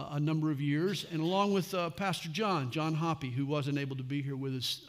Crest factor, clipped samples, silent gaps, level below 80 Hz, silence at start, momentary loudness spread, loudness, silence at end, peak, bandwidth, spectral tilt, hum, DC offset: 16 dB; under 0.1%; none; -70 dBFS; 0 s; 5 LU; -33 LUFS; 0 s; -16 dBFS; 15.5 kHz; -6 dB/octave; none; under 0.1%